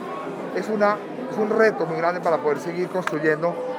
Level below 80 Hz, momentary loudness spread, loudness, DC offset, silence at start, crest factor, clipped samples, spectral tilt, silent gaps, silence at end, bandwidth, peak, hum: -84 dBFS; 10 LU; -23 LUFS; under 0.1%; 0 s; 18 dB; under 0.1%; -6.5 dB/octave; none; 0 s; 14.5 kHz; -4 dBFS; none